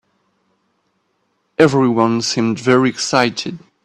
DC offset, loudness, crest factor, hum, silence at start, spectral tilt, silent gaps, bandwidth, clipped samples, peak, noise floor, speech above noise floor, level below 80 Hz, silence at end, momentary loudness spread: under 0.1%; -15 LUFS; 18 dB; none; 1.6 s; -5 dB/octave; none; 11.5 kHz; under 0.1%; 0 dBFS; -66 dBFS; 51 dB; -58 dBFS; 0.25 s; 11 LU